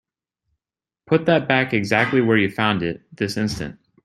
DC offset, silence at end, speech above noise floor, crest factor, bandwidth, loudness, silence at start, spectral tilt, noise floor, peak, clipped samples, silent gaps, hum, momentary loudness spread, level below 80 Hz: under 0.1%; 0.35 s; over 70 dB; 20 dB; 13.5 kHz; -20 LUFS; 1.1 s; -6 dB/octave; under -90 dBFS; -2 dBFS; under 0.1%; none; none; 10 LU; -52 dBFS